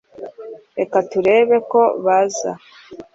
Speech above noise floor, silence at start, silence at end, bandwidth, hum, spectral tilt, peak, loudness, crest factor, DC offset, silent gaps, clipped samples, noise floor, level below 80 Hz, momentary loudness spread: 20 dB; 0.2 s; 0.1 s; 7.8 kHz; none; -4.5 dB/octave; -4 dBFS; -17 LUFS; 14 dB; under 0.1%; none; under 0.1%; -36 dBFS; -62 dBFS; 20 LU